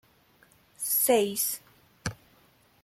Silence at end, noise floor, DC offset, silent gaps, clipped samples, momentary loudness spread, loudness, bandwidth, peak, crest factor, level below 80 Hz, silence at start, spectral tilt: 0.7 s; -62 dBFS; under 0.1%; none; under 0.1%; 16 LU; -27 LUFS; 16.5 kHz; -12 dBFS; 20 dB; -62 dBFS; 0.8 s; -2.5 dB/octave